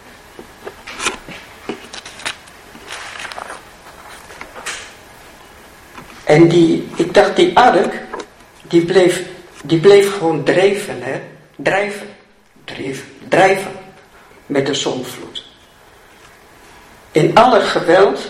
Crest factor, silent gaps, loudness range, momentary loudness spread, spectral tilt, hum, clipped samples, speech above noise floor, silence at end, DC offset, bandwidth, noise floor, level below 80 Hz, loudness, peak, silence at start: 16 dB; none; 16 LU; 24 LU; -5 dB/octave; none; under 0.1%; 36 dB; 0 s; under 0.1%; 15 kHz; -48 dBFS; -50 dBFS; -14 LUFS; 0 dBFS; 0.65 s